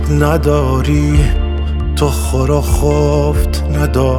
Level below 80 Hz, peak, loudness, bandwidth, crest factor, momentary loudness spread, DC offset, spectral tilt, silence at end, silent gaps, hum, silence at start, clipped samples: -16 dBFS; 0 dBFS; -14 LUFS; 16 kHz; 12 dB; 4 LU; under 0.1%; -6.5 dB/octave; 0 s; none; none; 0 s; under 0.1%